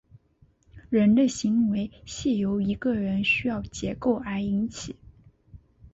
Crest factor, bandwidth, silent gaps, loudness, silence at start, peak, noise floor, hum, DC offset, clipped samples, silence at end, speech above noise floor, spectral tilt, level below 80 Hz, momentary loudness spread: 14 dB; 8 kHz; none; -25 LUFS; 0.75 s; -12 dBFS; -62 dBFS; none; under 0.1%; under 0.1%; 0.05 s; 37 dB; -5.5 dB/octave; -50 dBFS; 12 LU